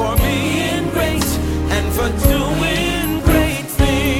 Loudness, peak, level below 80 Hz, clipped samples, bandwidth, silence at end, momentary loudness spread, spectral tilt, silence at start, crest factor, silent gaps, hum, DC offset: -17 LUFS; 0 dBFS; -22 dBFS; under 0.1%; 17 kHz; 0 s; 3 LU; -5 dB/octave; 0 s; 16 dB; none; none; under 0.1%